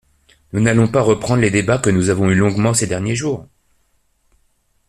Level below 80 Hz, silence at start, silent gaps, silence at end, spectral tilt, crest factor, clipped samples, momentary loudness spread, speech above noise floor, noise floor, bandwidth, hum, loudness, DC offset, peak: -46 dBFS; 0.55 s; none; 1.45 s; -5.5 dB/octave; 16 dB; under 0.1%; 7 LU; 46 dB; -61 dBFS; 13.5 kHz; none; -16 LUFS; under 0.1%; -2 dBFS